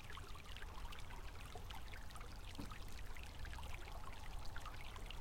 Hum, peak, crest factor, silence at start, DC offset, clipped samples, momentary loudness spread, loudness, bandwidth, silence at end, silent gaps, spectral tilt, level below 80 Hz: none; -34 dBFS; 14 dB; 0 s; under 0.1%; under 0.1%; 2 LU; -53 LUFS; 16.5 kHz; 0 s; none; -4 dB/octave; -52 dBFS